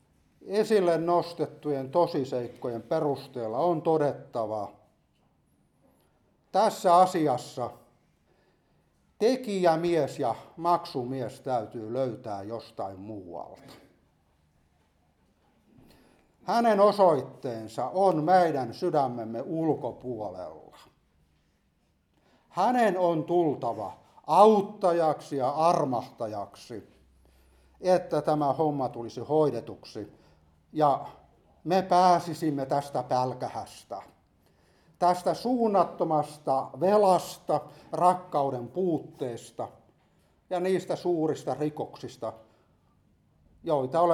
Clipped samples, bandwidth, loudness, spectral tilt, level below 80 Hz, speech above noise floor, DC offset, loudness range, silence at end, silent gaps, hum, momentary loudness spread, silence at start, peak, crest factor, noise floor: under 0.1%; 14.5 kHz; -27 LUFS; -6.5 dB/octave; -70 dBFS; 43 dB; under 0.1%; 8 LU; 0 s; none; none; 17 LU; 0.45 s; -6 dBFS; 24 dB; -70 dBFS